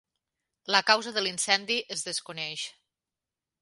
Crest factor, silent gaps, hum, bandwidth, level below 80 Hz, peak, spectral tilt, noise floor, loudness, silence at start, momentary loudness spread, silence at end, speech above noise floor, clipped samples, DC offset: 26 dB; none; none; 11.5 kHz; -82 dBFS; -4 dBFS; -0.5 dB/octave; -90 dBFS; -27 LUFS; 0.7 s; 13 LU; 0.9 s; 62 dB; under 0.1%; under 0.1%